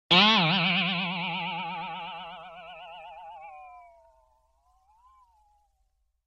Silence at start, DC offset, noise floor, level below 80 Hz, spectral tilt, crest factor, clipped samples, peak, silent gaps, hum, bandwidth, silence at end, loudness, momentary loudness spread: 0.1 s; under 0.1%; -73 dBFS; -70 dBFS; -4.5 dB/octave; 24 dB; under 0.1%; -6 dBFS; none; none; 10 kHz; 2.45 s; -24 LUFS; 25 LU